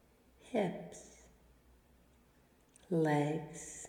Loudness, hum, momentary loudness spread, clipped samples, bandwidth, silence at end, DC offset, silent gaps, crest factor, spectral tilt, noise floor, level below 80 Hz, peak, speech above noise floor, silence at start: -36 LUFS; none; 20 LU; under 0.1%; 18.5 kHz; 0 s; under 0.1%; none; 18 dB; -6 dB/octave; -68 dBFS; -70 dBFS; -22 dBFS; 32 dB; 0.45 s